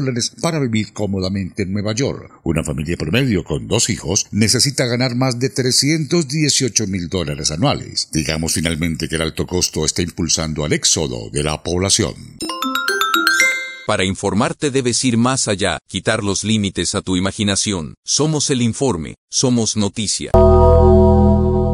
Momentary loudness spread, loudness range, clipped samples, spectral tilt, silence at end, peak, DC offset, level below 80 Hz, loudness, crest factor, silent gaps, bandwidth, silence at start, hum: 8 LU; 3 LU; under 0.1%; -4 dB/octave; 0 s; 0 dBFS; under 0.1%; -32 dBFS; -17 LUFS; 16 dB; 17.97-18.03 s, 19.18-19.28 s; 16 kHz; 0 s; none